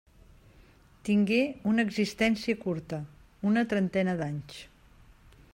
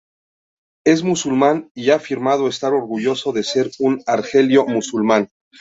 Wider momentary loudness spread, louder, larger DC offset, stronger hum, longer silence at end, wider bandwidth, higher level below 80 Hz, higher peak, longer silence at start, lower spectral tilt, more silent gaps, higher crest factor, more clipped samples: first, 13 LU vs 5 LU; second, -29 LUFS vs -18 LUFS; neither; neither; first, 0.85 s vs 0.35 s; first, 15.5 kHz vs 8 kHz; about the same, -58 dBFS vs -62 dBFS; second, -14 dBFS vs -2 dBFS; first, 1.05 s vs 0.85 s; first, -6.5 dB/octave vs -5 dB/octave; second, none vs 1.71-1.75 s; about the same, 16 dB vs 16 dB; neither